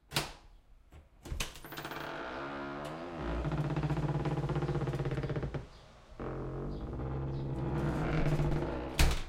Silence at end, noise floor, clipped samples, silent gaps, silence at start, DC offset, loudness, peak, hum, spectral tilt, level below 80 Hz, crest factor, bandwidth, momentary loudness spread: 0 s; -58 dBFS; under 0.1%; none; 0.1 s; under 0.1%; -37 LUFS; -14 dBFS; none; -6 dB/octave; -40 dBFS; 22 dB; 16.5 kHz; 12 LU